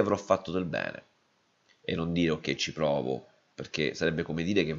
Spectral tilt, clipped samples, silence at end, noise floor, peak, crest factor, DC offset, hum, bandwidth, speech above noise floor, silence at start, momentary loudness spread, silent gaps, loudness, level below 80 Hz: -5.5 dB/octave; under 0.1%; 0 s; -70 dBFS; -10 dBFS; 22 dB; under 0.1%; none; 7.6 kHz; 40 dB; 0 s; 11 LU; none; -30 LUFS; -58 dBFS